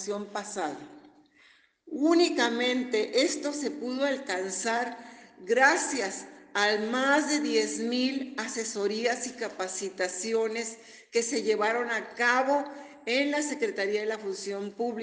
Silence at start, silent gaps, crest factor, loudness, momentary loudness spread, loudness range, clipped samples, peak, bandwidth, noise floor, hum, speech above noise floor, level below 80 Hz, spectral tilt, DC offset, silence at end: 0 s; none; 20 dB; -28 LUFS; 11 LU; 3 LU; under 0.1%; -8 dBFS; 10 kHz; -61 dBFS; none; 33 dB; -78 dBFS; -2 dB/octave; under 0.1%; 0 s